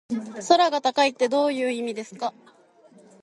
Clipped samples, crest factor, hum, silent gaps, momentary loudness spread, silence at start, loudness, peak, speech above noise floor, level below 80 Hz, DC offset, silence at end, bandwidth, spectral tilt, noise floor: under 0.1%; 20 dB; none; none; 13 LU; 0.1 s; -23 LUFS; -4 dBFS; 32 dB; -74 dBFS; under 0.1%; 0.9 s; 11.5 kHz; -3 dB/octave; -55 dBFS